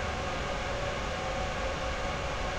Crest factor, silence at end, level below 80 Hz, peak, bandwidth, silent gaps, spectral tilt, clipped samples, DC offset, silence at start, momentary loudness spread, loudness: 12 dB; 0 s; -40 dBFS; -20 dBFS; 13 kHz; none; -4 dB/octave; under 0.1%; under 0.1%; 0 s; 0 LU; -33 LUFS